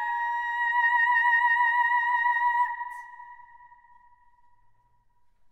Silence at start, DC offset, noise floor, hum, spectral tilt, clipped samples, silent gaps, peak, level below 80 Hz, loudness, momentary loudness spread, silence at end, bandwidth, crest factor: 0 s; under 0.1%; -63 dBFS; none; 1.5 dB/octave; under 0.1%; none; -14 dBFS; -72 dBFS; -23 LUFS; 15 LU; 2.15 s; 11.5 kHz; 14 dB